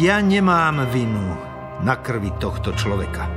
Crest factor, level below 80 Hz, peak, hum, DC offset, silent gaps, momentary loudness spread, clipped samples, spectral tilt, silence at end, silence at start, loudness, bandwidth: 18 dB; -34 dBFS; -2 dBFS; none; under 0.1%; none; 9 LU; under 0.1%; -6.5 dB/octave; 0 s; 0 s; -20 LUFS; 15 kHz